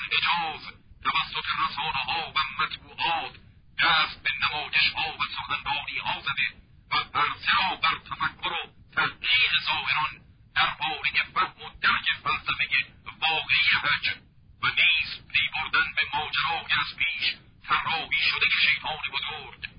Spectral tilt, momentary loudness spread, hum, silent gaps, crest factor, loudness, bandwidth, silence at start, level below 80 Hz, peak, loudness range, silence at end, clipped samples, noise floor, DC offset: -6 dB/octave; 9 LU; none; none; 18 dB; -25 LUFS; 5.4 kHz; 0 s; -54 dBFS; -8 dBFS; 3 LU; 0.1 s; under 0.1%; -50 dBFS; under 0.1%